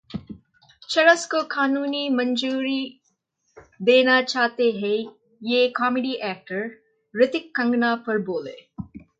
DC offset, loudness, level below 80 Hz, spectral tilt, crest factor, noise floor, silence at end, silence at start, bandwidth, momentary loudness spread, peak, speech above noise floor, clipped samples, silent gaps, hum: under 0.1%; -22 LUFS; -62 dBFS; -4 dB/octave; 20 dB; -70 dBFS; 0.2 s; 0.1 s; 9.2 kHz; 18 LU; -4 dBFS; 49 dB; under 0.1%; none; none